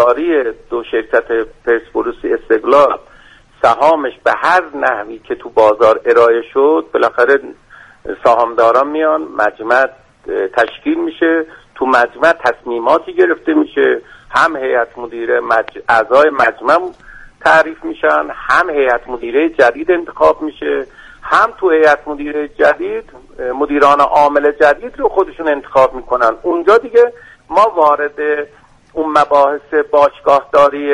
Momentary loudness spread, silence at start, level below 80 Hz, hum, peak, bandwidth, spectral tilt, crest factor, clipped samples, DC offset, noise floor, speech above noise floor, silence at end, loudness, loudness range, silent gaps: 10 LU; 0 s; -46 dBFS; none; 0 dBFS; 11 kHz; -4.5 dB/octave; 12 dB; under 0.1%; under 0.1%; -43 dBFS; 30 dB; 0 s; -13 LUFS; 2 LU; none